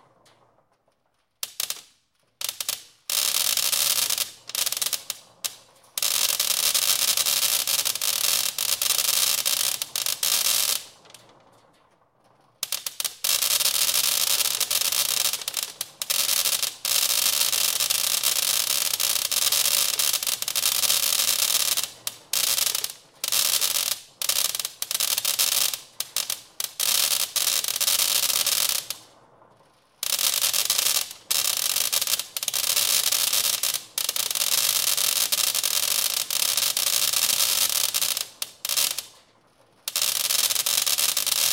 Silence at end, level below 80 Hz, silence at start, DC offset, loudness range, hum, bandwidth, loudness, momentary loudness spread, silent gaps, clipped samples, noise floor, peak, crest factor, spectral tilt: 0 s; -72 dBFS; 1.45 s; under 0.1%; 3 LU; none; 17.5 kHz; -21 LUFS; 10 LU; none; under 0.1%; -71 dBFS; -4 dBFS; 22 dB; 3 dB/octave